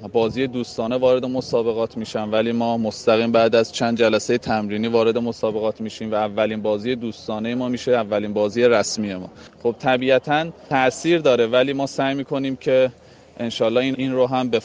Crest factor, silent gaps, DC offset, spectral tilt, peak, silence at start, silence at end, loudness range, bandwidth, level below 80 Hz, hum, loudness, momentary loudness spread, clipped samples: 16 dB; none; under 0.1%; -5 dB/octave; -4 dBFS; 0 s; 0 s; 3 LU; 9.8 kHz; -56 dBFS; none; -21 LUFS; 8 LU; under 0.1%